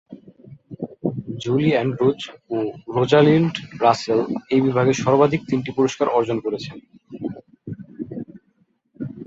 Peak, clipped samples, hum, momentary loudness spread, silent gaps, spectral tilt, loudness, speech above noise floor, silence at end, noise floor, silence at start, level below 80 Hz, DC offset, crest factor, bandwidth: -2 dBFS; under 0.1%; none; 18 LU; none; -6.5 dB/octave; -20 LUFS; 45 dB; 0 s; -64 dBFS; 0.1 s; -58 dBFS; under 0.1%; 20 dB; 8 kHz